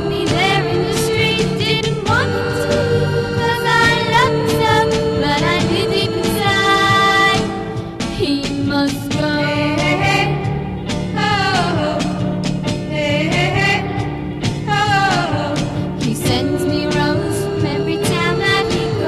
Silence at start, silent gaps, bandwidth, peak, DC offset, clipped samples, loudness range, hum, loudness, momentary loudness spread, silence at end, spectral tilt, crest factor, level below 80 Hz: 0 s; none; 14.5 kHz; 0 dBFS; under 0.1%; under 0.1%; 3 LU; none; -16 LUFS; 8 LU; 0 s; -5 dB/octave; 16 dB; -36 dBFS